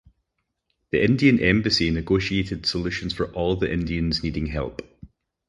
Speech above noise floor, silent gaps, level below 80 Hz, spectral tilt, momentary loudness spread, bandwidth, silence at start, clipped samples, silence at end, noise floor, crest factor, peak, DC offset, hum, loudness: 55 dB; none; -38 dBFS; -6 dB/octave; 10 LU; 11.5 kHz; 0.95 s; under 0.1%; 0.4 s; -77 dBFS; 20 dB; -4 dBFS; under 0.1%; none; -23 LUFS